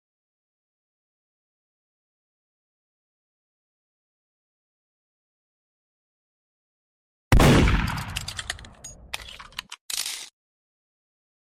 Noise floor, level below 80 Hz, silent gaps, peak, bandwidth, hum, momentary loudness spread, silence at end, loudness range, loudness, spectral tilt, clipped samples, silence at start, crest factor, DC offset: -45 dBFS; -34 dBFS; 9.81-9.89 s; -10 dBFS; 15.5 kHz; none; 20 LU; 1.15 s; 9 LU; -23 LUFS; -5 dB/octave; under 0.1%; 7.3 s; 20 dB; under 0.1%